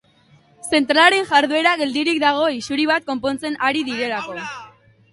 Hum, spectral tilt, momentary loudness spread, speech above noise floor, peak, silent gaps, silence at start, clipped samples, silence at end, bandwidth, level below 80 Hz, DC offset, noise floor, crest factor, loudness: none; -2.5 dB/octave; 15 LU; 36 dB; 0 dBFS; none; 0.65 s; under 0.1%; 0.45 s; 11.5 kHz; -62 dBFS; under 0.1%; -54 dBFS; 20 dB; -18 LUFS